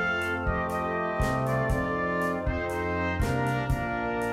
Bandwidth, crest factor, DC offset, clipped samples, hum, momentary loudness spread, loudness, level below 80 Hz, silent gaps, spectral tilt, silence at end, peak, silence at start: 16 kHz; 14 dB; under 0.1%; under 0.1%; none; 2 LU; -28 LUFS; -38 dBFS; none; -6.5 dB/octave; 0 s; -14 dBFS; 0 s